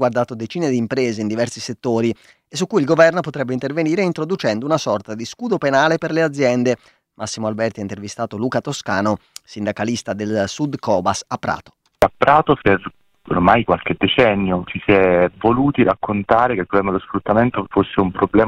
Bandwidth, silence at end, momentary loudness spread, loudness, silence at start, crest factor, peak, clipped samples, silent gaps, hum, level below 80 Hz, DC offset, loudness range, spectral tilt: 15.5 kHz; 0 s; 11 LU; -18 LUFS; 0 s; 18 dB; 0 dBFS; under 0.1%; none; none; -46 dBFS; under 0.1%; 6 LU; -5.5 dB/octave